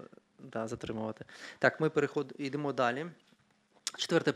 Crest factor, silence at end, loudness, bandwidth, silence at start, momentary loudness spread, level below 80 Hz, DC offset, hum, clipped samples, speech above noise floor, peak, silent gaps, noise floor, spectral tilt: 24 dB; 0 s; -34 LUFS; 14 kHz; 0 s; 13 LU; -72 dBFS; under 0.1%; none; under 0.1%; 36 dB; -10 dBFS; none; -69 dBFS; -4.5 dB/octave